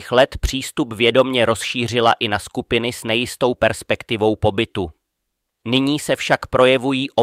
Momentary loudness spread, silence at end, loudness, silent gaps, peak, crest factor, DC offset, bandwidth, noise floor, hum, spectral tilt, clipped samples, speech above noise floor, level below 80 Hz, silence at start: 9 LU; 0 s; -18 LUFS; none; -2 dBFS; 18 dB; under 0.1%; 16 kHz; -76 dBFS; none; -4.5 dB/octave; under 0.1%; 58 dB; -38 dBFS; 0 s